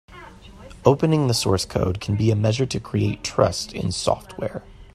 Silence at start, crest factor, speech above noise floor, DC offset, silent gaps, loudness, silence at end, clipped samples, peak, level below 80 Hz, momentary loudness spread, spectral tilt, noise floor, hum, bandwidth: 0.1 s; 22 dB; 21 dB; under 0.1%; none; -22 LUFS; 0.1 s; under 0.1%; 0 dBFS; -44 dBFS; 11 LU; -5.5 dB/octave; -43 dBFS; none; 13 kHz